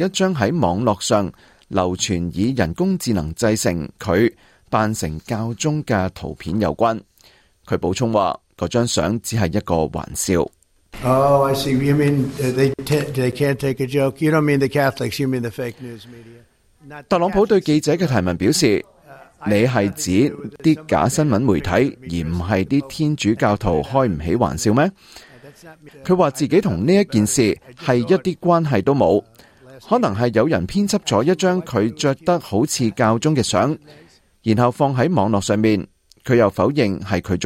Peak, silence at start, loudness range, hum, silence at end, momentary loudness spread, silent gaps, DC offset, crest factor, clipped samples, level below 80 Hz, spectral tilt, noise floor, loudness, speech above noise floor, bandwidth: -4 dBFS; 0 s; 3 LU; none; 0 s; 7 LU; none; under 0.1%; 16 dB; under 0.1%; -46 dBFS; -5.5 dB/octave; -53 dBFS; -19 LUFS; 35 dB; 16 kHz